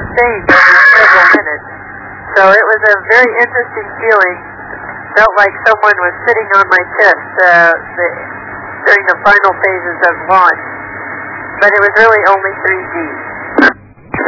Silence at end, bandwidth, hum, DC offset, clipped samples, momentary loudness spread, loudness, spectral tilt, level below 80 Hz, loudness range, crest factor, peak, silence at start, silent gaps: 0 s; 6 kHz; none; under 0.1%; 3%; 18 LU; -8 LUFS; -5 dB/octave; -44 dBFS; 4 LU; 10 dB; 0 dBFS; 0 s; none